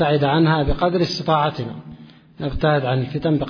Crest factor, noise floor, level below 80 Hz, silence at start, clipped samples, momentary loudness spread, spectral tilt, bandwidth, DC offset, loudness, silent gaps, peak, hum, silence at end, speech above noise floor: 14 dB; -42 dBFS; -34 dBFS; 0 s; under 0.1%; 13 LU; -7 dB/octave; 5.4 kHz; under 0.1%; -20 LUFS; none; -4 dBFS; none; 0 s; 24 dB